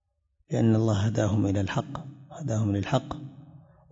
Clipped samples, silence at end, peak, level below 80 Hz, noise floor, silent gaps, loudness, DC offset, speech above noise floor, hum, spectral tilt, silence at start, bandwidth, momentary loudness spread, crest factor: under 0.1%; 0.35 s; -10 dBFS; -56 dBFS; -70 dBFS; none; -27 LUFS; under 0.1%; 44 dB; none; -7 dB/octave; 0.5 s; 7.8 kHz; 16 LU; 18 dB